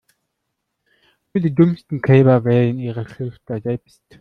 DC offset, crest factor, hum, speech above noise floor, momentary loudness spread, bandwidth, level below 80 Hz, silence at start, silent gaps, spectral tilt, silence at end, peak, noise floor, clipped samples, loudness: under 0.1%; 16 dB; none; 59 dB; 15 LU; 5 kHz; -56 dBFS; 1.35 s; none; -10 dB/octave; 0.45 s; -2 dBFS; -76 dBFS; under 0.1%; -18 LUFS